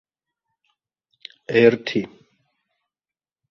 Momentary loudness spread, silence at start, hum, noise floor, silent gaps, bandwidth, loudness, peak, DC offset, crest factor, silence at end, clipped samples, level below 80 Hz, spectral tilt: 21 LU; 1.5 s; none; under -90 dBFS; none; 6.8 kHz; -19 LUFS; -2 dBFS; under 0.1%; 22 dB; 1.45 s; under 0.1%; -66 dBFS; -6.5 dB/octave